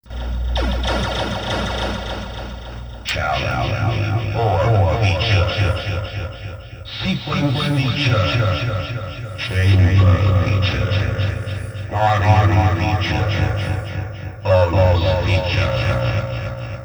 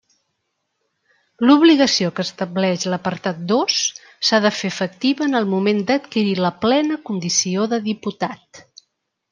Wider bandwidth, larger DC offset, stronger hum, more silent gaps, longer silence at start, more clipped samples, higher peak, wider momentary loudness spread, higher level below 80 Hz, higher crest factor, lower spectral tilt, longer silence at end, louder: first, over 20 kHz vs 10.5 kHz; neither; neither; neither; second, 0.05 s vs 1.4 s; neither; about the same, -2 dBFS vs -2 dBFS; first, 13 LU vs 10 LU; first, -30 dBFS vs -66 dBFS; about the same, 16 dB vs 18 dB; first, -6.5 dB/octave vs -4 dB/octave; second, 0 s vs 0.7 s; about the same, -19 LUFS vs -18 LUFS